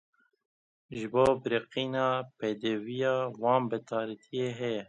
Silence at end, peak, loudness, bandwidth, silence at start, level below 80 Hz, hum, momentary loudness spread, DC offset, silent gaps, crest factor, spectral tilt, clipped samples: 0.05 s; -12 dBFS; -31 LUFS; 11 kHz; 0.9 s; -66 dBFS; none; 9 LU; under 0.1%; none; 20 dB; -6 dB/octave; under 0.1%